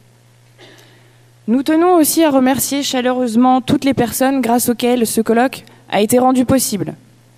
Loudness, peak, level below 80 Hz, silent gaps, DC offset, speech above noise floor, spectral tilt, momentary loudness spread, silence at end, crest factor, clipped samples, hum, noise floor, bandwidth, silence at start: -14 LUFS; -2 dBFS; -52 dBFS; none; under 0.1%; 35 dB; -4 dB/octave; 7 LU; 0.4 s; 12 dB; under 0.1%; none; -48 dBFS; 16 kHz; 1.45 s